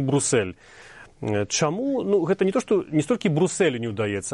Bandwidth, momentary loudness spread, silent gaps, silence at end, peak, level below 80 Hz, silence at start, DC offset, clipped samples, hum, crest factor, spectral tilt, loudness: 11.5 kHz; 6 LU; none; 0 s; -8 dBFS; -58 dBFS; 0 s; under 0.1%; under 0.1%; none; 14 dB; -5 dB/octave; -23 LUFS